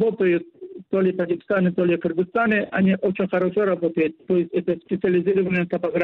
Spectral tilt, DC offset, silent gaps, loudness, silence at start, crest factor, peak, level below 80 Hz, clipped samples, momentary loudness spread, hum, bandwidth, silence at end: -10 dB/octave; under 0.1%; none; -22 LUFS; 0 s; 12 dB; -10 dBFS; -60 dBFS; under 0.1%; 5 LU; none; 4.2 kHz; 0 s